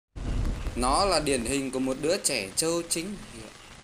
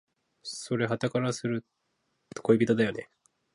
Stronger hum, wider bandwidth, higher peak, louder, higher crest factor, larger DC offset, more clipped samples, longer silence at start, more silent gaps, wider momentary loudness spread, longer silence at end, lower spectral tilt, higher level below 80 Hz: neither; first, 16 kHz vs 11.5 kHz; about the same, -10 dBFS vs -10 dBFS; about the same, -27 LUFS vs -29 LUFS; about the same, 20 dB vs 22 dB; neither; neither; second, 0.15 s vs 0.45 s; neither; about the same, 16 LU vs 17 LU; second, 0 s vs 0.5 s; second, -3.5 dB/octave vs -6 dB/octave; first, -38 dBFS vs -68 dBFS